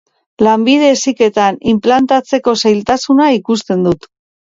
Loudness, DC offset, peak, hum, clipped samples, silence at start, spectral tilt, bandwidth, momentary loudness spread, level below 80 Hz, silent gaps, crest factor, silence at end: -12 LUFS; under 0.1%; 0 dBFS; none; under 0.1%; 0.4 s; -4.5 dB/octave; 7.8 kHz; 5 LU; -50 dBFS; none; 12 dB; 0.55 s